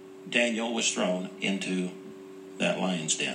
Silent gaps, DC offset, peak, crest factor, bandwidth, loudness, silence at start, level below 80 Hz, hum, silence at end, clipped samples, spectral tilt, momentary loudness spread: none; under 0.1%; -10 dBFS; 20 dB; 10.5 kHz; -28 LUFS; 0 s; -82 dBFS; none; 0 s; under 0.1%; -3 dB/octave; 18 LU